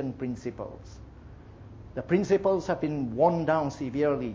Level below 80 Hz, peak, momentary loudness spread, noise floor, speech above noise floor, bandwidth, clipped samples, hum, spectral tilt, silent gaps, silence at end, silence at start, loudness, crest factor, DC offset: -52 dBFS; -10 dBFS; 23 LU; -47 dBFS; 20 dB; 7.8 kHz; under 0.1%; none; -7.5 dB/octave; none; 0 s; 0 s; -27 LUFS; 18 dB; under 0.1%